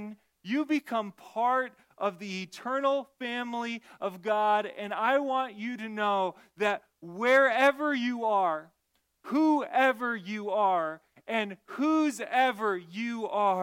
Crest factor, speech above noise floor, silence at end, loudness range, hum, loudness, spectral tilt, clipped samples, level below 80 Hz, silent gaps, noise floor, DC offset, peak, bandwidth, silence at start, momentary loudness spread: 18 dB; 48 dB; 0 s; 4 LU; none; -29 LUFS; -4.5 dB/octave; under 0.1%; -82 dBFS; none; -76 dBFS; under 0.1%; -10 dBFS; 16.5 kHz; 0 s; 12 LU